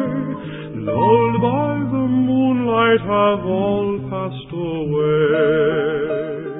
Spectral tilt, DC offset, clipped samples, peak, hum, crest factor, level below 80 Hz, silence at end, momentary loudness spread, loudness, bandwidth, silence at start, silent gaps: -12 dB/octave; under 0.1%; under 0.1%; -2 dBFS; none; 14 dB; -48 dBFS; 0 s; 11 LU; -18 LUFS; 4 kHz; 0 s; none